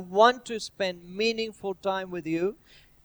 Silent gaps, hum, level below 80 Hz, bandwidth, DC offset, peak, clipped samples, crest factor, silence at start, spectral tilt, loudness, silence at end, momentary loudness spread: none; none; -64 dBFS; over 20 kHz; under 0.1%; -4 dBFS; under 0.1%; 22 dB; 0 s; -4 dB/octave; -28 LUFS; 0.5 s; 11 LU